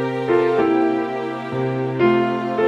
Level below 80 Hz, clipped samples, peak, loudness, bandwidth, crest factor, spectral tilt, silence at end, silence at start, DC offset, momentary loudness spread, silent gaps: -58 dBFS; under 0.1%; -4 dBFS; -19 LUFS; 7.4 kHz; 14 dB; -8 dB/octave; 0 s; 0 s; under 0.1%; 7 LU; none